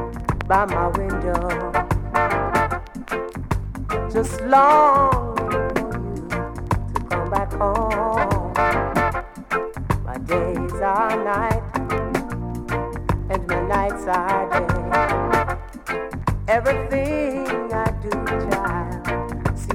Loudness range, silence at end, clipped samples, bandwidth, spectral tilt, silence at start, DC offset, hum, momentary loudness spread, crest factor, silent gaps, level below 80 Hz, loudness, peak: 4 LU; 0 s; under 0.1%; 16.5 kHz; -6.5 dB/octave; 0 s; under 0.1%; none; 8 LU; 18 dB; none; -32 dBFS; -22 LUFS; -2 dBFS